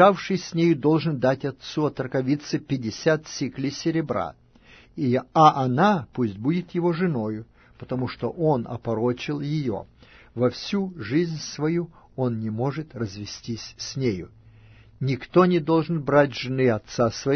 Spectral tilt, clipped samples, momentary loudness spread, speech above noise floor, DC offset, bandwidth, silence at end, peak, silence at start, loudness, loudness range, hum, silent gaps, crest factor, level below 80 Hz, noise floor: -6.5 dB/octave; under 0.1%; 12 LU; 29 dB; under 0.1%; 6.6 kHz; 0 s; -2 dBFS; 0 s; -24 LUFS; 5 LU; none; none; 22 dB; -56 dBFS; -52 dBFS